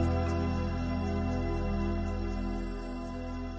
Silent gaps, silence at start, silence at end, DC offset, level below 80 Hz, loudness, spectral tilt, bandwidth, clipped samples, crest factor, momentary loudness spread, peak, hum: none; 0 s; 0 s; under 0.1%; -36 dBFS; -34 LUFS; -8 dB/octave; 8 kHz; under 0.1%; 14 dB; 8 LU; -18 dBFS; none